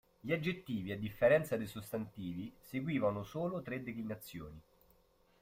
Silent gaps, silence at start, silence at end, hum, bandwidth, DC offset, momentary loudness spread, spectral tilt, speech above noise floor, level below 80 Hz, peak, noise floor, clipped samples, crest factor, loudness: none; 0.25 s; 0.8 s; none; 16 kHz; under 0.1%; 15 LU; -6.5 dB/octave; 33 dB; -66 dBFS; -18 dBFS; -70 dBFS; under 0.1%; 20 dB; -38 LUFS